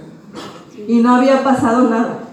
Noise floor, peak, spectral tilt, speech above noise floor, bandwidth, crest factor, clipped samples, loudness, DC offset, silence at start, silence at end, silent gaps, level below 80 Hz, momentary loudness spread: -33 dBFS; 0 dBFS; -6 dB/octave; 20 dB; 10.5 kHz; 14 dB; under 0.1%; -13 LUFS; under 0.1%; 0 s; 0 s; none; -58 dBFS; 21 LU